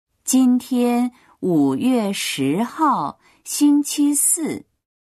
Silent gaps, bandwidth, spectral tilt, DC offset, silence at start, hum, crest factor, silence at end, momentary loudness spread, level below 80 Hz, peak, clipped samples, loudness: none; 13.5 kHz; -4 dB/octave; under 0.1%; 0.25 s; none; 12 dB; 0.5 s; 11 LU; -66 dBFS; -6 dBFS; under 0.1%; -19 LUFS